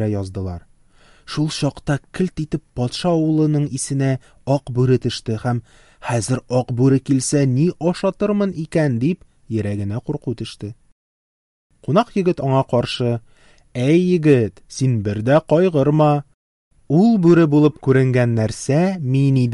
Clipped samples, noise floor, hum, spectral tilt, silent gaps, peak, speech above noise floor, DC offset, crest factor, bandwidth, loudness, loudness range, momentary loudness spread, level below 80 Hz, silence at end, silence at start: under 0.1%; -51 dBFS; none; -7 dB/octave; 10.92-11.70 s, 16.34-16.71 s; -2 dBFS; 33 dB; under 0.1%; 16 dB; 11.5 kHz; -18 LUFS; 7 LU; 11 LU; -48 dBFS; 0 s; 0 s